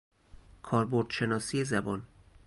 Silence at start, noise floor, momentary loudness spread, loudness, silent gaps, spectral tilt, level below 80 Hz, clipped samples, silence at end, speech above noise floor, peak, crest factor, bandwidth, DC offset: 0.65 s; -54 dBFS; 9 LU; -31 LUFS; none; -5.5 dB/octave; -58 dBFS; under 0.1%; 0.4 s; 24 dB; -14 dBFS; 18 dB; 11.5 kHz; under 0.1%